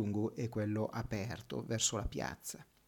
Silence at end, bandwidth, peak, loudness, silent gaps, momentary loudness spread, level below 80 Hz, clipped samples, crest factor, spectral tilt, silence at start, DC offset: 0.25 s; 19 kHz; -20 dBFS; -38 LUFS; none; 9 LU; -54 dBFS; under 0.1%; 18 dB; -4 dB/octave; 0 s; under 0.1%